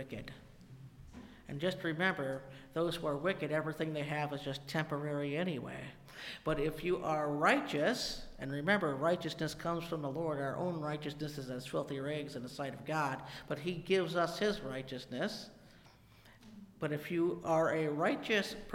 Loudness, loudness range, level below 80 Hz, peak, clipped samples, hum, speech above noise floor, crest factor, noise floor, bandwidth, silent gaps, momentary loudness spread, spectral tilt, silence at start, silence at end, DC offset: -36 LUFS; 5 LU; -60 dBFS; -16 dBFS; under 0.1%; none; 25 dB; 22 dB; -61 dBFS; 16.5 kHz; none; 15 LU; -5.5 dB/octave; 0 s; 0 s; under 0.1%